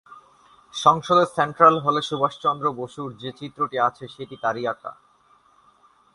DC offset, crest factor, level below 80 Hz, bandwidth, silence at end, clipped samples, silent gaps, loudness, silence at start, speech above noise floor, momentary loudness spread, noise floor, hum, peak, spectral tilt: under 0.1%; 22 dB; -64 dBFS; 11.5 kHz; 1.25 s; under 0.1%; none; -21 LUFS; 0.1 s; 36 dB; 19 LU; -58 dBFS; none; -2 dBFS; -5 dB/octave